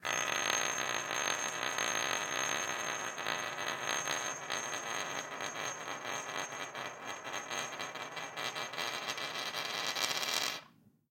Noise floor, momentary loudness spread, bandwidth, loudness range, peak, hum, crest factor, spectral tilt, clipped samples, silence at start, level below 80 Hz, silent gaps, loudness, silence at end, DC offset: -62 dBFS; 8 LU; 17 kHz; 6 LU; -14 dBFS; none; 24 dB; 0 dB/octave; under 0.1%; 0 s; -84 dBFS; none; -36 LUFS; 0.2 s; under 0.1%